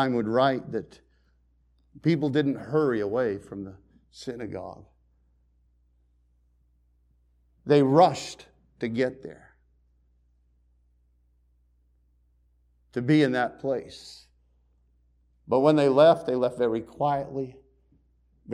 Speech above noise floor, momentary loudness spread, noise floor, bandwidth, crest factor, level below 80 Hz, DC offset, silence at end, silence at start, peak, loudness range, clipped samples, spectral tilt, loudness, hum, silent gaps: 41 dB; 23 LU; -65 dBFS; 11 kHz; 22 dB; -62 dBFS; under 0.1%; 0 s; 0 s; -6 dBFS; 16 LU; under 0.1%; -7 dB/octave; -25 LUFS; 60 Hz at -60 dBFS; none